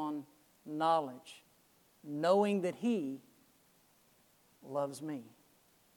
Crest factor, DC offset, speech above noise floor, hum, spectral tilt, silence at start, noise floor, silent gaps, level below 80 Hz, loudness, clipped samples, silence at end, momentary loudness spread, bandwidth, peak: 22 dB; under 0.1%; 35 dB; none; -6 dB/octave; 0 s; -69 dBFS; none; -88 dBFS; -35 LUFS; under 0.1%; 0.7 s; 23 LU; 19 kHz; -16 dBFS